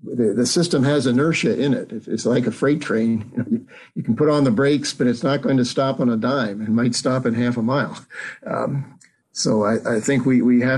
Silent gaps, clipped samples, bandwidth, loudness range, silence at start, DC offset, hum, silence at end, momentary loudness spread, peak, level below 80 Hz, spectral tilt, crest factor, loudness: none; under 0.1%; 12 kHz; 3 LU; 0.05 s; under 0.1%; none; 0 s; 10 LU; -8 dBFS; -60 dBFS; -5.5 dB/octave; 12 dB; -20 LUFS